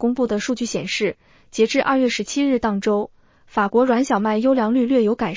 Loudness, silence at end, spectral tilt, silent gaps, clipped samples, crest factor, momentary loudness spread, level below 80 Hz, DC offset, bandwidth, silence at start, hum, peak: -20 LUFS; 0 s; -5 dB/octave; none; under 0.1%; 16 dB; 6 LU; -54 dBFS; under 0.1%; 7.6 kHz; 0 s; none; -4 dBFS